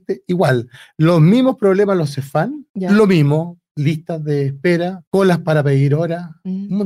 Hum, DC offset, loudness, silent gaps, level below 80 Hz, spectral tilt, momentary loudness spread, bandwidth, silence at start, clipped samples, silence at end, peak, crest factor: none; under 0.1%; -16 LUFS; 2.70-2.74 s, 3.71-3.75 s, 5.07-5.11 s; -58 dBFS; -8 dB/octave; 11 LU; 12.5 kHz; 0.1 s; under 0.1%; 0 s; -4 dBFS; 12 dB